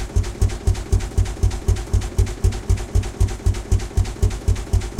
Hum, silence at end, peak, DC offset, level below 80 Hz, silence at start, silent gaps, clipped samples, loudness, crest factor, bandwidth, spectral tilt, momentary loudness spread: none; 0 s; -6 dBFS; under 0.1%; -22 dBFS; 0 s; none; under 0.1%; -23 LUFS; 14 dB; 14 kHz; -6 dB/octave; 3 LU